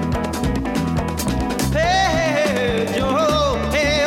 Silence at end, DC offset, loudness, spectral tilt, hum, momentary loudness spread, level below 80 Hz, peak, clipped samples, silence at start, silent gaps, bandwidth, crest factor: 0 s; under 0.1%; -19 LUFS; -5 dB/octave; none; 5 LU; -30 dBFS; -4 dBFS; under 0.1%; 0 s; none; 17.5 kHz; 14 dB